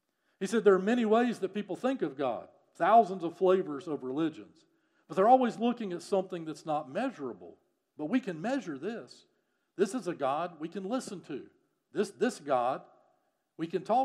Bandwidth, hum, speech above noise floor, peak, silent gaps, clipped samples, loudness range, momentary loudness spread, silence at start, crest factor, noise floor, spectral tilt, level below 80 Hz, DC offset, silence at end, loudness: 12.5 kHz; none; 44 dB; -10 dBFS; none; under 0.1%; 8 LU; 16 LU; 0.4 s; 20 dB; -75 dBFS; -6 dB/octave; under -90 dBFS; under 0.1%; 0 s; -31 LUFS